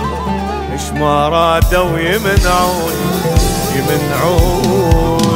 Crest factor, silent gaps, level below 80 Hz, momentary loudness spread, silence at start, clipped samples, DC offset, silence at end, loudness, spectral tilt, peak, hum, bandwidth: 12 dB; none; -20 dBFS; 7 LU; 0 s; under 0.1%; under 0.1%; 0 s; -13 LUFS; -5 dB/octave; 0 dBFS; none; 16.5 kHz